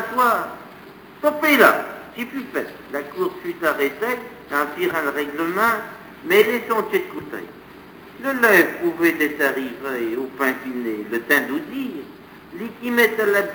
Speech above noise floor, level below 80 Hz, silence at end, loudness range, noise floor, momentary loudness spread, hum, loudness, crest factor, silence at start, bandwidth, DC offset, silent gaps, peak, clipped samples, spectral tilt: 21 dB; -60 dBFS; 0 s; 4 LU; -42 dBFS; 17 LU; none; -20 LUFS; 22 dB; 0 s; over 20 kHz; under 0.1%; none; 0 dBFS; under 0.1%; -4 dB/octave